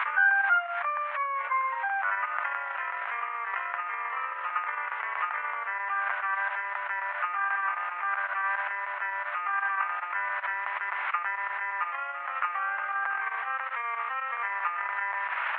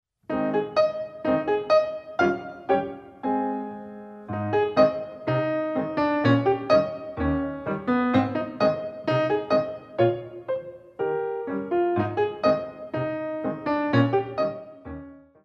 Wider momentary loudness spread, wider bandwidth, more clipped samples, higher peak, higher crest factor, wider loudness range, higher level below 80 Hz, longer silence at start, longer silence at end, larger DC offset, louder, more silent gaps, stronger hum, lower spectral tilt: second, 4 LU vs 11 LU; second, 4.5 kHz vs 6.8 kHz; neither; second, -12 dBFS vs -6 dBFS; about the same, 18 dB vs 20 dB; about the same, 2 LU vs 3 LU; second, under -90 dBFS vs -52 dBFS; second, 0 s vs 0.3 s; second, 0 s vs 0.25 s; neither; second, -30 LUFS vs -25 LUFS; neither; neither; second, 1 dB/octave vs -8 dB/octave